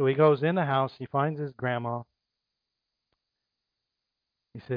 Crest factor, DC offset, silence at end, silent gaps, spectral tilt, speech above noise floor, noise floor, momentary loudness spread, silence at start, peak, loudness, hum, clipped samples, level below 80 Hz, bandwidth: 20 dB; under 0.1%; 0 s; none; -10 dB/octave; 59 dB; -85 dBFS; 10 LU; 0 s; -10 dBFS; -27 LUFS; none; under 0.1%; -74 dBFS; 5.2 kHz